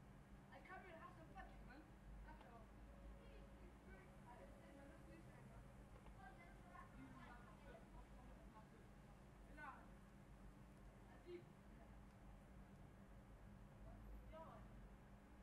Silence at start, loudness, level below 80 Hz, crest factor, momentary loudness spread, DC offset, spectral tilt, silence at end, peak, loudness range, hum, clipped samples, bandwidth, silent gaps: 0 s; -63 LUFS; -66 dBFS; 18 dB; 5 LU; under 0.1%; -6.5 dB/octave; 0 s; -44 dBFS; 2 LU; none; under 0.1%; 13 kHz; none